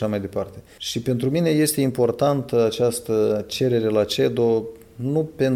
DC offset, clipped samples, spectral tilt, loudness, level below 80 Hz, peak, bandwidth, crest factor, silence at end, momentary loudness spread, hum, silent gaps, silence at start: under 0.1%; under 0.1%; -5.5 dB/octave; -22 LUFS; -54 dBFS; -8 dBFS; 16.5 kHz; 14 dB; 0 s; 10 LU; none; none; 0 s